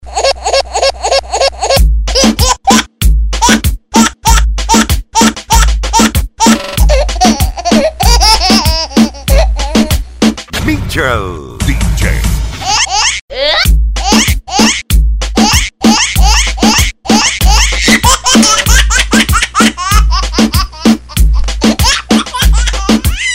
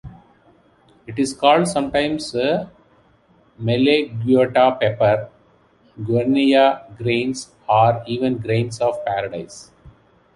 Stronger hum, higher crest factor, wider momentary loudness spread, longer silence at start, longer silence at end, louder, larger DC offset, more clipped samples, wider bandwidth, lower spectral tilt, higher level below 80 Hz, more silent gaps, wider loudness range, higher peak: neither; second, 10 dB vs 18 dB; second, 5 LU vs 14 LU; about the same, 0 s vs 0.05 s; second, 0 s vs 0.45 s; first, -9 LUFS vs -19 LUFS; first, 0.6% vs under 0.1%; first, 0.2% vs under 0.1%; first, 16.5 kHz vs 11.5 kHz; second, -3.5 dB/octave vs -6 dB/octave; first, -14 dBFS vs -52 dBFS; first, 13.21-13.28 s vs none; about the same, 4 LU vs 3 LU; about the same, 0 dBFS vs -2 dBFS